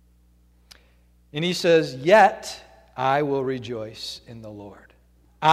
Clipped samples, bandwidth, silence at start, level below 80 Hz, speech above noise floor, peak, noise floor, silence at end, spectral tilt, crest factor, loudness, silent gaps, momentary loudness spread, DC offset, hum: under 0.1%; 15.5 kHz; 1.35 s; -58 dBFS; 36 dB; -4 dBFS; -58 dBFS; 0 s; -5 dB/octave; 20 dB; -21 LUFS; none; 24 LU; under 0.1%; 60 Hz at -55 dBFS